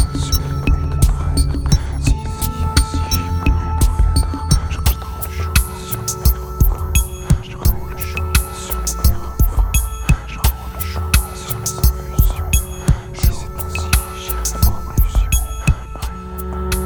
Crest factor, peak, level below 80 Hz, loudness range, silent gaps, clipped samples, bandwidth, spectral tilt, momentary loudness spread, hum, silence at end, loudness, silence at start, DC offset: 16 dB; 0 dBFS; -18 dBFS; 1 LU; none; under 0.1%; over 20 kHz; -4.5 dB/octave; 6 LU; none; 0 s; -19 LUFS; 0 s; under 0.1%